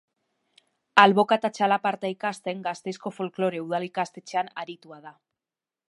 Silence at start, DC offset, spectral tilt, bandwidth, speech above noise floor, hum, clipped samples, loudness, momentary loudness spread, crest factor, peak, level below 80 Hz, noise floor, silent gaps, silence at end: 0.95 s; under 0.1%; -5 dB/octave; 11.5 kHz; over 65 dB; none; under 0.1%; -25 LUFS; 16 LU; 26 dB; 0 dBFS; -78 dBFS; under -90 dBFS; none; 0.8 s